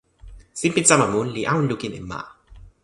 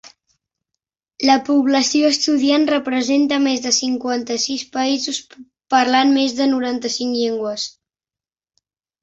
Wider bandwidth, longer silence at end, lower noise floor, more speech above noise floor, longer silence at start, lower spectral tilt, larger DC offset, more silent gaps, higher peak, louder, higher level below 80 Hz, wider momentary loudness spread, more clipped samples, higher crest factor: first, 11.5 kHz vs 8 kHz; second, 0.15 s vs 1.35 s; second, -44 dBFS vs under -90 dBFS; second, 23 dB vs over 73 dB; first, 0.25 s vs 0.05 s; first, -4 dB/octave vs -1.5 dB/octave; neither; neither; about the same, 0 dBFS vs -2 dBFS; about the same, -20 LUFS vs -18 LUFS; first, -48 dBFS vs -64 dBFS; first, 19 LU vs 7 LU; neither; about the same, 22 dB vs 18 dB